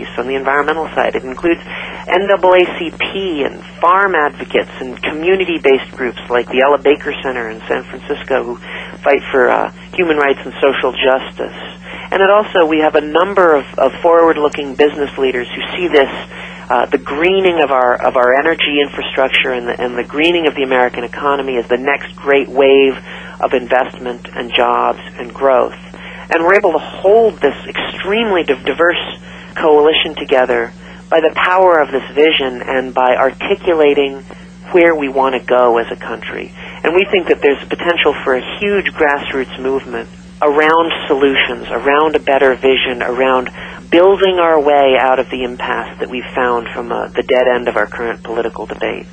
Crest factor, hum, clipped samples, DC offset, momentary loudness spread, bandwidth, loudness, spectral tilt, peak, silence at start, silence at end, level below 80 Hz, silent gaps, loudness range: 14 dB; 60 Hz at -35 dBFS; under 0.1%; under 0.1%; 11 LU; 9 kHz; -13 LUFS; -5.5 dB/octave; 0 dBFS; 0 s; 0 s; -44 dBFS; none; 3 LU